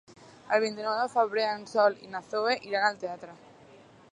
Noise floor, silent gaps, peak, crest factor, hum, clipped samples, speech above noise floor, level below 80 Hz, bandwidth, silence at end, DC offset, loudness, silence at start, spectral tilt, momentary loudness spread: -54 dBFS; none; -10 dBFS; 20 dB; none; under 0.1%; 26 dB; -76 dBFS; 10.5 kHz; 0.75 s; under 0.1%; -28 LUFS; 0.1 s; -3.5 dB/octave; 13 LU